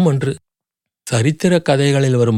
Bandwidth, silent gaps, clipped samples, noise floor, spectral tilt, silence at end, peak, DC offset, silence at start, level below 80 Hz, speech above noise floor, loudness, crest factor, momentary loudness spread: 14 kHz; none; under 0.1%; -83 dBFS; -6 dB/octave; 0 s; -2 dBFS; under 0.1%; 0 s; -56 dBFS; 69 dB; -16 LUFS; 14 dB; 13 LU